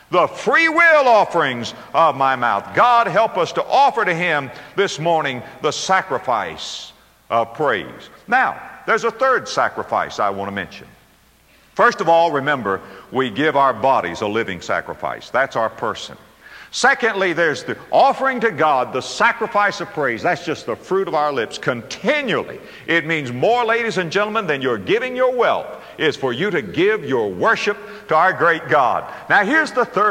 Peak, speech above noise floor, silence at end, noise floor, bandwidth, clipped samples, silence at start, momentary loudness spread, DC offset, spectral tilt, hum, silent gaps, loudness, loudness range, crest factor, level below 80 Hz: -4 dBFS; 35 dB; 0 s; -53 dBFS; 16 kHz; under 0.1%; 0.1 s; 11 LU; under 0.1%; -4 dB/octave; none; none; -18 LUFS; 4 LU; 16 dB; -58 dBFS